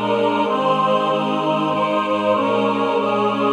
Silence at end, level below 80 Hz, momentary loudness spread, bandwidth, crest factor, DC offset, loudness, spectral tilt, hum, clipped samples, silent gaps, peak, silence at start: 0 s; -70 dBFS; 2 LU; 11.5 kHz; 14 dB; under 0.1%; -18 LUFS; -6.5 dB/octave; none; under 0.1%; none; -6 dBFS; 0 s